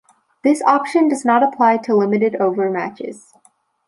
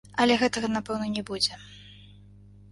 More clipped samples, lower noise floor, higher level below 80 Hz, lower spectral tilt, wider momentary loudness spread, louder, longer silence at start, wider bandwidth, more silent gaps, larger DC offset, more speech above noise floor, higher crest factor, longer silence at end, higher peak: neither; first, -58 dBFS vs -51 dBFS; second, -72 dBFS vs -56 dBFS; first, -6 dB/octave vs -3.5 dB/octave; second, 10 LU vs 23 LU; first, -17 LUFS vs -26 LUFS; first, 0.45 s vs 0.15 s; about the same, 11.5 kHz vs 11.5 kHz; neither; neither; first, 41 dB vs 25 dB; about the same, 16 dB vs 20 dB; about the same, 0.7 s vs 0.6 s; first, -2 dBFS vs -10 dBFS